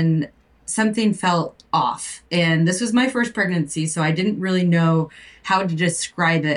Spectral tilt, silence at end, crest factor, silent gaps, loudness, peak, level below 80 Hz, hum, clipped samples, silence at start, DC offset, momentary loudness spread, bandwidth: -5 dB/octave; 0 s; 14 dB; none; -20 LUFS; -6 dBFS; -58 dBFS; none; under 0.1%; 0 s; under 0.1%; 6 LU; 11.5 kHz